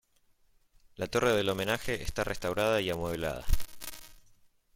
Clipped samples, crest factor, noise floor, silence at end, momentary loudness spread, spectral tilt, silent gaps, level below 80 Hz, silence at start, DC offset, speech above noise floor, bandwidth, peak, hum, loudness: under 0.1%; 20 dB; -67 dBFS; 0.55 s; 15 LU; -4.5 dB/octave; none; -40 dBFS; 1 s; under 0.1%; 38 dB; 17 kHz; -12 dBFS; none; -31 LUFS